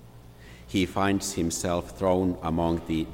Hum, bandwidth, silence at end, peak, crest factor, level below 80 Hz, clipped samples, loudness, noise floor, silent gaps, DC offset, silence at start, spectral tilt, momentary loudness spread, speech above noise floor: none; 16.5 kHz; 0 s; -10 dBFS; 16 dB; -48 dBFS; under 0.1%; -27 LUFS; -48 dBFS; none; under 0.1%; 0 s; -5 dB/octave; 4 LU; 21 dB